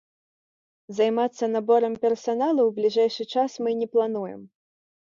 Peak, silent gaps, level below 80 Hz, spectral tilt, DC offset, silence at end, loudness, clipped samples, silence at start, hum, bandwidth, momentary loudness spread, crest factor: -8 dBFS; none; -76 dBFS; -5.5 dB/octave; under 0.1%; 0.55 s; -24 LUFS; under 0.1%; 0.9 s; none; 7.4 kHz; 8 LU; 16 dB